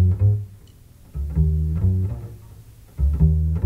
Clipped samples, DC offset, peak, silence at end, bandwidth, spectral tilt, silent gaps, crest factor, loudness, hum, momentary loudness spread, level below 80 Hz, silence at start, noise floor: under 0.1%; under 0.1%; -6 dBFS; 0 s; 2.2 kHz; -10.5 dB/octave; none; 16 dB; -22 LUFS; none; 20 LU; -26 dBFS; 0 s; -47 dBFS